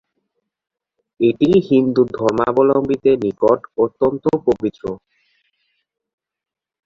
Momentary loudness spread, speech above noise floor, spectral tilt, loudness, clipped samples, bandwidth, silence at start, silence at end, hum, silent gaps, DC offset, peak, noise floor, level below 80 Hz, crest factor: 7 LU; 57 dB; -8 dB/octave; -17 LUFS; under 0.1%; 7.4 kHz; 1.2 s; 1.9 s; none; none; under 0.1%; -2 dBFS; -73 dBFS; -52 dBFS; 16 dB